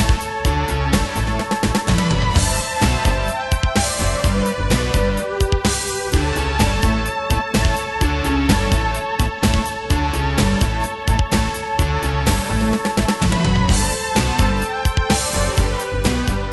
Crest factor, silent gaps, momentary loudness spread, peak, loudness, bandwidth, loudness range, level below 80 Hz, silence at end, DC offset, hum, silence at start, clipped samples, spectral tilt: 16 dB; none; 4 LU; -2 dBFS; -19 LUFS; 12.5 kHz; 1 LU; -22 dBFS; 0 s; under 0.1%; none; 0 s; under 0.1%; -4.5 dB/octave